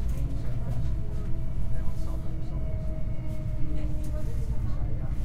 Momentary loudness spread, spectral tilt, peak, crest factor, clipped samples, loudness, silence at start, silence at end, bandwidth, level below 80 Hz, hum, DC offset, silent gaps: 3 LU; -8.5 dB/octave; -14 dBFS; 12 dB; under 0.1%; -34 LUFS; 0 s; 0 s; 4.6 kHz; -30 dBFS; none; under 0.1%; none